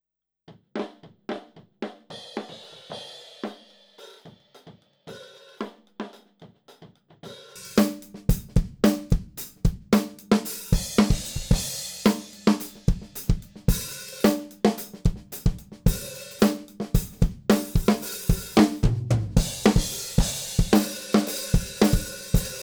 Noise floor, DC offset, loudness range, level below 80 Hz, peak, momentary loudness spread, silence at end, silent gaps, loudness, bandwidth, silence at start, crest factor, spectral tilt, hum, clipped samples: -57 dBFS; under 0.1%; 18 LU; -32 dBFS; -6 dBFS; 17 LU; 0 s; none; -25 LUFS; over 20 kHz; 0.5 s; 20 dB; -5.5 dB/octave; none; under 0.1%